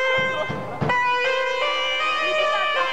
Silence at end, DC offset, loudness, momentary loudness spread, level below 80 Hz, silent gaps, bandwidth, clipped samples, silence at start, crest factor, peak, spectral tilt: 0 s; 1%; -21 LUFS; 5 LU; -56 dBFS; none; 12.5 kHz; under 0.1%; 0 s; 12 dB; -10 dBFS; -3.5 dB/octave